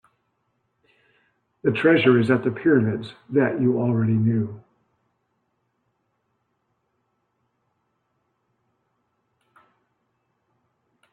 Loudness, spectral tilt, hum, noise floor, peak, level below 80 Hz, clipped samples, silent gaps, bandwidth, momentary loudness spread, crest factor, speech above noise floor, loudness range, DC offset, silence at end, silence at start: -21 LUFS; -9 dB/octave; none; -73 dBFS; -4 dBFS; -66 dBFS; under 0.1%; none; 9.2 kHz; 9 LU; 22 dB; 53 dB; 8 LU; under 0.1%; 6.55 s; 1.65 s